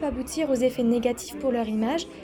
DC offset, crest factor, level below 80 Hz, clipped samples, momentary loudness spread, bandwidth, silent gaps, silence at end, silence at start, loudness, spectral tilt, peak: under 0.1%; 14 dB; -48 dBFS; under 0.1%; 5 LU; over 20 kHz; none; 0 s; 0 s; -26 LUFS; -5 dB/octave; -12 dBFS